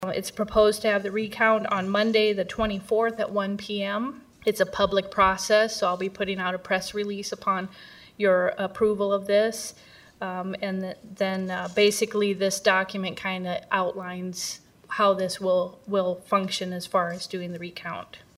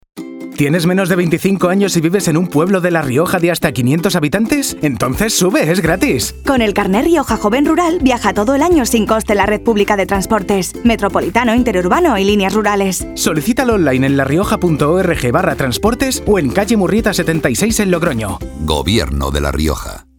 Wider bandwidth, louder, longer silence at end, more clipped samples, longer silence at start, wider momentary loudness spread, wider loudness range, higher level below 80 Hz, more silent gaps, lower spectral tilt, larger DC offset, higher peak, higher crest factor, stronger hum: second, 16 kHz vs 19.5 kHz; second, -25 LUFS vs -14 LUFS; about the same, 0.2 s vs 0.15 s; neither; second, 0 s vs 0.15 s; first, 12 LU vs 4 LU; about the same, 2 LU vs 1 LU; second, -54 dBFS vs -30 dBFS; neither; about the same, -4 dB/octave vs -5 dB/octave; neither; second, -4 dBFS vs 0 dBFS; first, 20 dB vs 14 dB; neither